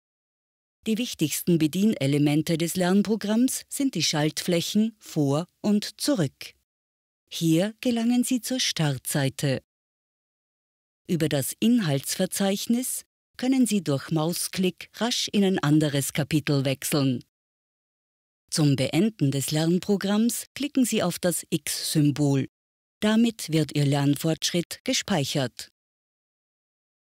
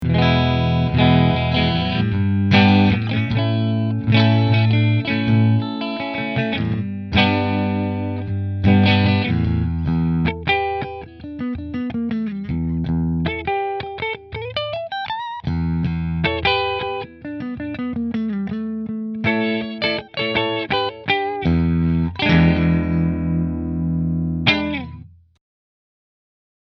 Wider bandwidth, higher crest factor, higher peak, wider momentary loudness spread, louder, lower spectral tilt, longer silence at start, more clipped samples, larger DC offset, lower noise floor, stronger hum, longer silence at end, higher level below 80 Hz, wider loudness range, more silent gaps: first, 16 kHz vs 6.2 kHz; second, 14 dB vs 20 dB; second, -12 dBFS vs 0 dBFS; second, 6 LU vs 11 LU; second, -25 LUFS vs -19 LUFS; second, -5 dB/octave vs -8.5 dB/octave; first, 0.85 s vs 0 s; neither; neither; first, under -90 dBFS vs -39 dBFS; neither; second, 1.45 s vs 1.7 s; second, -64 dBFS vs -36 dBFS; second, 3 LU vs 7 LU; first, 6.64-7.27 s, 9.64-11.05 s, 13.06-13.34 s, 17.29-18.48 s, 20.47-20.55 s, 22.49-23.01 s, 24.65-24.70 s, 24.80-24.85 s vs none